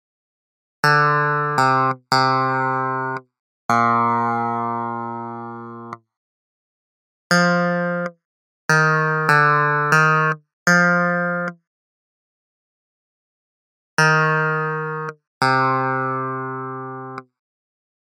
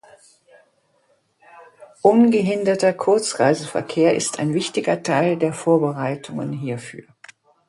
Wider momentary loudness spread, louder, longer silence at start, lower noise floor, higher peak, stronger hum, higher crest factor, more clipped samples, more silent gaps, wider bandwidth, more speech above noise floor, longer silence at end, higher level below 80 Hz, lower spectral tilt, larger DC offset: first, 16 LU vs 12 LU; about the same, -18 LUFS vs -19 LUFS; second, 0.85 s vs 1.55 s; first, under -90 dBFS vs -63 dBFS; about the same, 0 dBFS vs 0 dBFS; neither; about the same, 20 dB vs 20 dB; neither; first, 3.39-3.69 s, 6.17-7.30 s, 8.25-8.69 s, 10.53-10.66 s, 11.67-13.97 s, 15.27-15.41 s vs none; first, 15.5 kHz vs 11.5 kHz; first, over 73 dB vs 44 dB; first, 0.85 s vs 0.7 s; second, -74 dBFS vs -66 dBFS; about the same, -5 dB/octave vs -5.5 dB/octave; neither